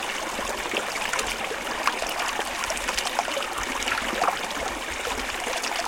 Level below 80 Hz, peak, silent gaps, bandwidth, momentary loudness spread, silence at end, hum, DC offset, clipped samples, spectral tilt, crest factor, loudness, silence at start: -48 dBFS; -4 dBFS; none; 17 kHz; 3 LU; 0 s; none; under 0.1%; under 0.1%; -1 dB/octave; 24 dB; -27 LUFS; 0 s